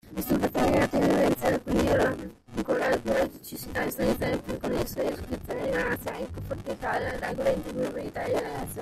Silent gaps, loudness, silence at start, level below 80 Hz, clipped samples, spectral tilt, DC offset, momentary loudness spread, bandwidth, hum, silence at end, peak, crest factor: none; -28 LUFS; 0.05 s; -46 dBFS; under 0.1%; -5.5 dB/octave; under 0.1%; 11 LU; 16 kHz; none; 0 s; -10 dBFS; 18 dB